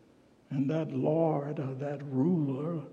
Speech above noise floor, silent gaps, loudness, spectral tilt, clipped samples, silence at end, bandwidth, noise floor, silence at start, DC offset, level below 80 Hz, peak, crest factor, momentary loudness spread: 31 dB; none; -31 LUFS; -10 dB/octave; under 0.1%; 0 s; 7 kHz; -61 dBFS; 0.5 s; under 0.1%; -80 dBFS; -16 dBFS; 16 dB; 8 LU